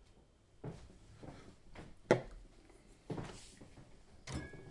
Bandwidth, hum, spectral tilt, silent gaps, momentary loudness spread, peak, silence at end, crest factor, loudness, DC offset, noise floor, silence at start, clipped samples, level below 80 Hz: 11.5 kHz; none; -6 dB/octave; none; 27 LU; -14 dBFS; 0 s; 32 dB; -41 LUFS; under 0.1%; -66 dBFS; 0 s; under 0.1%; -60 dBFS